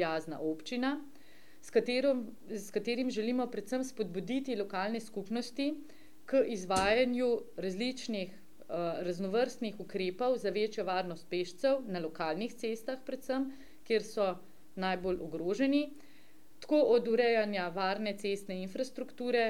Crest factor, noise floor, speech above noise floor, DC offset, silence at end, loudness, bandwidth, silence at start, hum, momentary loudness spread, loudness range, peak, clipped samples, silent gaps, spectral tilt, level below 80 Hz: 18 dB; -63 dBFS; 29 dB; 0.4%; 0 s; -34 LUFS; 16.5 kHz; 0 s; none; 11 LU; 4 LU; -16 dBFS; under 0.1%; none; -5 dB/octave; -66 dBFS